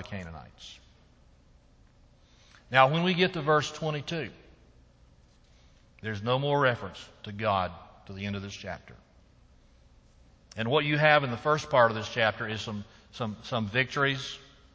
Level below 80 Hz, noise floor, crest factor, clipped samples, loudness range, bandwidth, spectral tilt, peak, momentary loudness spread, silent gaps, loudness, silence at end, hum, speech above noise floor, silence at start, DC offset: -58 dBFS; -59 dBFS; 26 dB; under 0.1%; 8 LU; 8 kHz; -5.5 dB/octave; -4 dBFS; 21 LU; none; -28 LUFS; 0.3 s; none; 31 dB; 0 s; under 0.1%